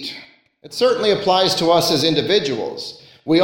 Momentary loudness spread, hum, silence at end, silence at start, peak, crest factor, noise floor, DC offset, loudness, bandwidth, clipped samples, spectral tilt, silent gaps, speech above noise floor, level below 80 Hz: 16 LU; none; 0 s; 0 s; -2 dBFS; 16 dB; -43 dBFS; under 0.1%; -17 LUFS; 17 kHz; under 0.1%; -4 dB/octave; none; 25 dB; -56 dBFS